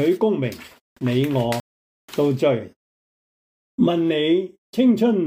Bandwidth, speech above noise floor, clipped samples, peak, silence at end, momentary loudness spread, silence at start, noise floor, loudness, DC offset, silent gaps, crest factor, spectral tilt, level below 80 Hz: 16 kHz; over 71 dB; under 0.1%; -6 dBFS; 0 s; 11 LU; 0 s; under -90 dBFS; -21 LUFS; under 0.1%; 0.81-0.96 s, 1.60-2.08 s, 2.76-3.78 s, 4.58-4.73 s; 14 dB; -7 dB/octave; -62 dBFS